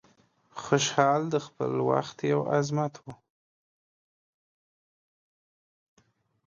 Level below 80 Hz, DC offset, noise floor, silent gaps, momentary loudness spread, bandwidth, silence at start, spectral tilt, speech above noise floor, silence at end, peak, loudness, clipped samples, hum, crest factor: -72 dBFS; under 0.1%; -64 dBFS; none; 19 LU; 7.6 kHz; 0.55 s; -5 dB/octave; 37 dB; 3.35 s; -6 dBFS; -27 LUFS; under 0.1%; none; 24 dB